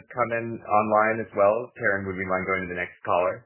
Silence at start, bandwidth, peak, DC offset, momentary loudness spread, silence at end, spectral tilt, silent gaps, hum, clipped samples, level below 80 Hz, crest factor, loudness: 0.1 s; 3.2 kHz; -8 dBFS; under 0.1%; 6 LU; 0.05 s; -10 dB/octave; none; none; under 0.1%; -56 dBFS; 18 dB; -25 LUFS